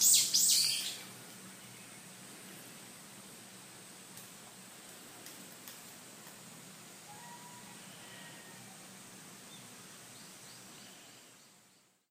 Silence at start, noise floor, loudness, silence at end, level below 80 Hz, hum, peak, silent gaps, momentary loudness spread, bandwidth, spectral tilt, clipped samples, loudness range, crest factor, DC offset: 0 s; -67 dBFS; -27 LUFS; 1.15 s; -86 dBFS; none; -12 dBFS; none; 21 LU; 16 kHz; 1 dB/octave; under 0.1%; 15 LU; 26 dB; under 0.1%